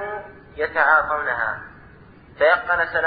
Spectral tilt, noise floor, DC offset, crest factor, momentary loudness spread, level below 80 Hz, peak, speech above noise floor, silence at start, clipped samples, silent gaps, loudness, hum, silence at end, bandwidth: -7.5 dB/octave; -46 dBFS; under 0.1%; 20 dB; 17 LU; -52 dBFS; -2 dBFS; 27 dB; 0 s; under 0.1%; none; -19 LUFS; none; 0 s; 5 kHz